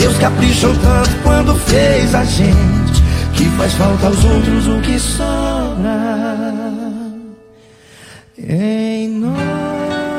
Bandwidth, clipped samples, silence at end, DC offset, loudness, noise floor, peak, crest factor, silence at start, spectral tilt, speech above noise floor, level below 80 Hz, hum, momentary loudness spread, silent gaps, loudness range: 16 kHz; under 0.1%; 0 s; under 0.1%; -14 LUFS; -43 dBFS; 0 dBFS; 12 dB; 0 s; -5.5 dB/octave; 30 dB; -20 dBFS; none; 9 LU; none; 9 LU